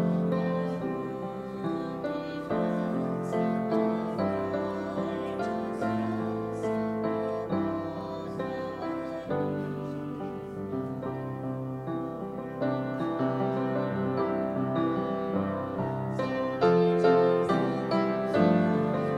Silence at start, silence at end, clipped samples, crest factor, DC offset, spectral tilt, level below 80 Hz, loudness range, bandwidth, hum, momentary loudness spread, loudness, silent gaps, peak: 0 s; 0 s; under 0.1%; 18 dB; under 0.1%; -8.5 dB/octave; -60 dBFS; 8 LU; 10.5 kHz; none; 11 LU; -30 LUFS; none; -10 dBFS